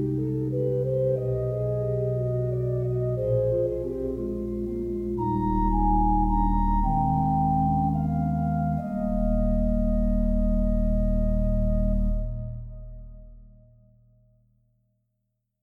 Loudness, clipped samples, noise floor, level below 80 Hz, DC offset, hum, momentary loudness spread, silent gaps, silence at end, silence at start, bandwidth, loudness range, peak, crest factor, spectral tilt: -26 LUFS; under 0.1%; -78 dBFS; -30 dBFS; under 0.1%; none; 7 LU; none; 2.15 s; 0 s; 2.2 kHz; 6 LU; -12 dBFS; 14 dB; -12 dB/octave